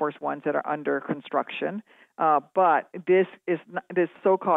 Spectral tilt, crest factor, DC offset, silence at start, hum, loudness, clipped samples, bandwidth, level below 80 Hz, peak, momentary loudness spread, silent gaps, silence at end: -9 dB/octave; 16 dB; under 0.1%; 0 s; none; -26 LUFS; under 0.1%; 4 kHz; -86 dBFS; -8 dBFS; 9 LU; none; 0 s